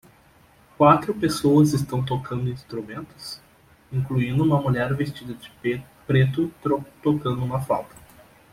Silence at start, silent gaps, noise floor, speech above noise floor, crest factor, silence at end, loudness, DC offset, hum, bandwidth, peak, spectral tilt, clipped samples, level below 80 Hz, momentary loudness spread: 0.8 s; none; -55 dBFS; 33 dB; 20 dB; 0.65 s; -23 LUFS; under 0.1%; none; 15.5 kHz; -2 dBFS; -7 dB/octave; under 0.1%; -52 dBFS; 18 LU